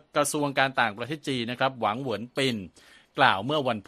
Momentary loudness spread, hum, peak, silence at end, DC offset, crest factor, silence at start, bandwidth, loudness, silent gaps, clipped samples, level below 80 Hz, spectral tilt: 11 LU; none; -4 dBFS; 0.05 s; under 0.1%; 24 dB; 0.15 s; 13.5 kHz; -26 LUFS; none; under 0.1%; -68 dBFS; -4 dB/octave